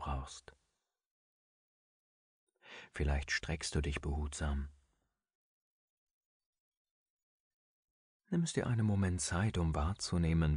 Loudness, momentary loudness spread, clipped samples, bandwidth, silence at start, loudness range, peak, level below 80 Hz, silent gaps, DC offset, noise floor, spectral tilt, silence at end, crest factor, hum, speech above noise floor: -36 LUFS; 16 LU; under 0.1%; 10.5 kHz; 0 s; 10 LU; -20 dBFS; -46 dBFS; 1.06-2.47 s, 5.35-6.40 s, 6.46-6.53 s, 6.60-6.85 s, 6.91-7.17 s, 7.23-8.20 s; under 0.1%; -86 dBFS; -5.5 dB/octave; 0 s; 20 dB; none; 51 dB